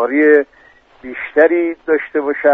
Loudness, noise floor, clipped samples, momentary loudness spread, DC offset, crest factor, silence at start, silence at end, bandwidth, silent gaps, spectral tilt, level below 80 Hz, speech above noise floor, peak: -14 LUFS; -44 dBFS; under 0.1%; 16 LU; under 0.1%; 14 dB; 0 s; 0 s; 3.9 kHz; none; -7 dB/octave; -58 dBFS; 32 dB; 0 dBFS